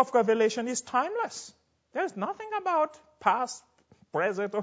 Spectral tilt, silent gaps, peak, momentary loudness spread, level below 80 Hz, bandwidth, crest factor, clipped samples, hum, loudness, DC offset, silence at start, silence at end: -3.5 dB/octave; none; -8 dBFS; 11 LU; -76 dBFS; 8 kHz; 20 dB; under 0.1%; none; -29 LUFS; under 0.1%; 0 s; 0 s